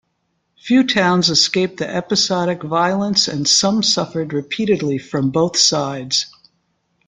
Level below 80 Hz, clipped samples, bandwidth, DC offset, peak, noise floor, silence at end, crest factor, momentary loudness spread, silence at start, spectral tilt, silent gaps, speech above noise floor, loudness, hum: -56 dBFS; under 0.1%; 11 kHz; under 0.1%; 0 dBFS; -69 dBFS; 0.8 s; 18 dB; 8 LU; 0.65 s; -3.5 dB/octave; none; 52 dB; -16 LUFS; none